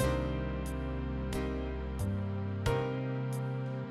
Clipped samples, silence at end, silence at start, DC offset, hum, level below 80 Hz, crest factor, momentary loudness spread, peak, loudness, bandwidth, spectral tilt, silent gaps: under 0.1%; 0 s; 0 s; under 0.1%; none; -42 dBFS; 16 dB; 5 LU; -18 dBFS; -36 LUFS; 14 kHz; -7 dB/octave; none